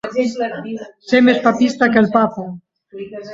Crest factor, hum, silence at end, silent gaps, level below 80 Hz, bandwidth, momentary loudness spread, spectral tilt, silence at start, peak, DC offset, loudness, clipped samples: 16 dB; none; 0 s; none; -58 dBFS; 7.8 kHz; 19 LU; -6 dB/octave; 0.05 s; 0 dBFS; under 0.1%; -15 LUFS; under 0.1%